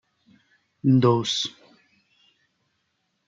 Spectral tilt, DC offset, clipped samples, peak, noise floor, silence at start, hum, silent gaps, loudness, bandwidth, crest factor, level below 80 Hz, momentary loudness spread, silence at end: -6 dB/octave; under 0.1%; under 0.1%; -6 dBFS; -74 dBFS; 0.85 s; none; none; -22 LUFS; 7.6 kHz; 20 dB; -72 dBFS; 9 LU; 1.8 s